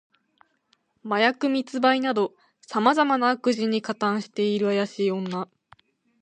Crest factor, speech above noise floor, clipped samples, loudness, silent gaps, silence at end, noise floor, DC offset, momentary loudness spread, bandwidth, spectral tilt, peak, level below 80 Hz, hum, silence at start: 20 dB; 45 dB; under 0.1%; -24 LUFS; none; 0.8 s; -68 dBFS; under 0.1%; 9 LU; 9.6 kHz; -5.5 dB/octave; -4 dBFS; -76 dBFS; none; 1.05 s